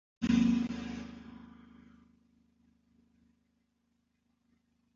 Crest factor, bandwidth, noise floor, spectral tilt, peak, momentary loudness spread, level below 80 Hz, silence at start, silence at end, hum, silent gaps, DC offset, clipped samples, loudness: 22 dB; 7.4 kHz; -78 dBFS; -6 dB/octave; -16 dBFS; 25 LU; -58 dBFS; 0.2 s; 3.45 s; none; none; under 0.1%; under 0.1%; -32 LUFS